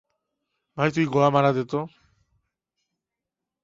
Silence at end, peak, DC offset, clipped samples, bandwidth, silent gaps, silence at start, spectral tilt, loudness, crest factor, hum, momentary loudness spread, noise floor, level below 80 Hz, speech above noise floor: 1.75 s; -6 dBFS; under 0.1%; under 0.1%; 7.6 kHz; none; 0.75 s; -7 dB/octave; -23 LUFS; 22 dB; none; 16 LU; -86 dBFS; -64 dBFS; 64 dB